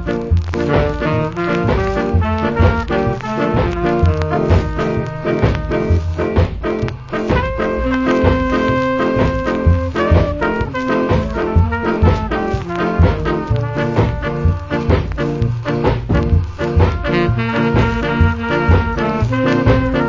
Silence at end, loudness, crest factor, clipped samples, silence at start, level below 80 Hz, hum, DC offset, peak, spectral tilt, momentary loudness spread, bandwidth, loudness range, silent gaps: 0 s; -16 LUFS; 16 dB; under 0.1%; 0 s; -22 dBFS; none; under 0.1%; 0 dBFS; -8 dB/octave; 4 LU; 7.4 kHz; 2 LU; none